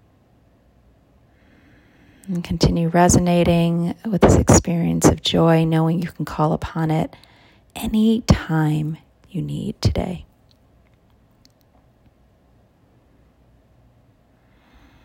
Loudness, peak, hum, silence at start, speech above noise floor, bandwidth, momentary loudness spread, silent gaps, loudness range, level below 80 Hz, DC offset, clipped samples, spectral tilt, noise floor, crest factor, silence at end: -19 LUFS; 0 dBFS; none; 2.25 s; 38 dB; 16.5 kHz; 14 LU; none; 13 LU; -36 dBFS; under 0.1%; under 0.1%; -5.5 dB/octave; -56 dBFS; 20 dB; 4.8 s